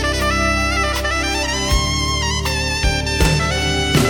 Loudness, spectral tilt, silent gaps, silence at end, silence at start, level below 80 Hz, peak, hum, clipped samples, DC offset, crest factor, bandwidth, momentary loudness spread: -17 LUFS; -3.5 dB/octave; none; 0 s; 0 s; -24 dBFS; -2 dBFS; none; under 0.1%; under 0.1%; 16 dB; 18 kHz; 2 LU